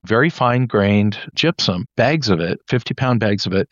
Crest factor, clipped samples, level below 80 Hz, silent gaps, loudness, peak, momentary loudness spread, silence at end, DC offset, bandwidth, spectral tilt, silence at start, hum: 16 dB; under 0.1%; -52 dBFS; none; -18 LUFS; -2 dBFS; 5 LU; 0.05 s; under 0.1%; 7.4 kHz; -6 dB/octave; 0.05 s; none